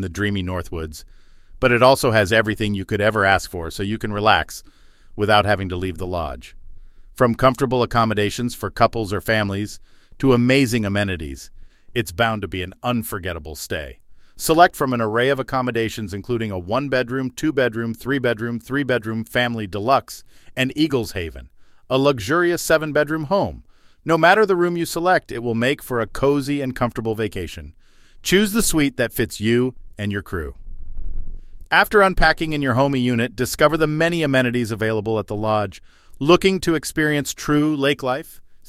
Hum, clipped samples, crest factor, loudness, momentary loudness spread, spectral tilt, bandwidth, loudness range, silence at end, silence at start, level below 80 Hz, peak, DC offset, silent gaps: none; under 0.1%; 20 dB; -20 LUFS; 14 LU; -5 dB/octave; 16.5 kHz; 4 LU; 0 s; 0 s; -38 dBFS; 0 dBFS; under 0.1%; none